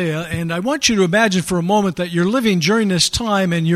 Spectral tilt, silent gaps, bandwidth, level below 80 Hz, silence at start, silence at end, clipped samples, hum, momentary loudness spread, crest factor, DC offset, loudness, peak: -4.5 dB/octave; none; 15 kHz; -44 dBFS; 0 s; 0 s; under 0.1%; none; 6 LU; 16 dB; under 0.1%; -16 LUFS; 0 dBFS